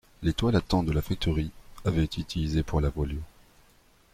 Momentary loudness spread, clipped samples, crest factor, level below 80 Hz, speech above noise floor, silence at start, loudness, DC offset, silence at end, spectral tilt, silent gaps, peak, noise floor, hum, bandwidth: 8 LU; under 0.1%; 18 dB; -38 dBFS; 33 dB; 0.2 s; -29 LUFS; under 0.1%; 0.85 s; -7 dB/octave; none; -12 dBFS; -60 dBFS; none; 15 kHz